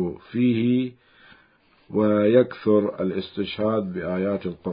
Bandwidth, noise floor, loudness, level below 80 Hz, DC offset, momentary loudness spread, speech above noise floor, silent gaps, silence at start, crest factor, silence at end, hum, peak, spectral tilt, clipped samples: 5.2 kHz; -59 dBFS; -23 LUFS; -56 dBFS; under 0.1%; 10 LU; 37 dB; none; 0 s; 18 dB; 0 s; none; -4 dBFS; -12 dB/octave; under 0.1%